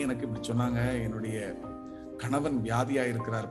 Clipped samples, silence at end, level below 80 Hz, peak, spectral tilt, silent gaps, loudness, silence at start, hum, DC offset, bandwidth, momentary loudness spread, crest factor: under 0.1%; 0 s; -52 dBFS; -14 dBFS; -6.5 dB/octave; none; -31 LUFS; 0 s; none; under 0.1%; 12.5 kHz; 12 LU; 18 dB